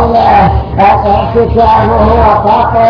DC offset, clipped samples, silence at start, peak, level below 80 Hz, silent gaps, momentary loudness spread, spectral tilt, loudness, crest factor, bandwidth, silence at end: under 0.1%; 2%; 0 s; 0 dBFS; -18 dBFS; none; 3 LU; -9 dB/octave; -7 LUFS; 6 dB; 5.4 kHz; 0 s